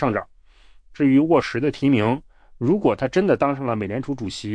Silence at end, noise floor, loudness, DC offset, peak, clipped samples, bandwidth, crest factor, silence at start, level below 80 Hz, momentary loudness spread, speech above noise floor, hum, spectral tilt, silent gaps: 0 s; -49 dBFS; -21 LUFS; under 0.1%; -6 dBFS; under 0.1%; 9.6 kHz; 16 dB; 0 s; -50 dBFS; 10 LU; 29 dB; none; -7 dB/octave; none